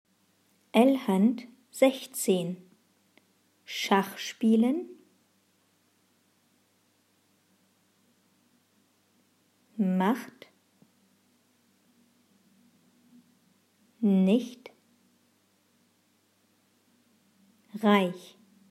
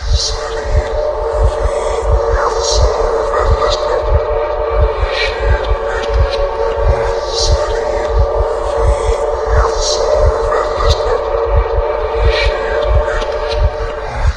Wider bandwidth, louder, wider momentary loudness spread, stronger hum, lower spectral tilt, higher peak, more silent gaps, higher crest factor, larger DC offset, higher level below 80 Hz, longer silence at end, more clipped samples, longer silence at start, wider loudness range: first, 15.5 kHz vs 10 kHz; second, -27 LUFS vs -15 LUFS; first, 21 LU vs 4 LU; neither; about the same, -5.5 dB/octave vs -4.5 dB/octave; second, -8 dBFS vs 0 dBFS; neither; first, 24 dB vs 14 dB; second, under 0.1% vs 0.4%; second, -88 dBFS vs -18 dBFS; first, 0.5 s vs 0 s; neither; first, 0.75 s vs 0 s; first, 7 LU vs 1 LU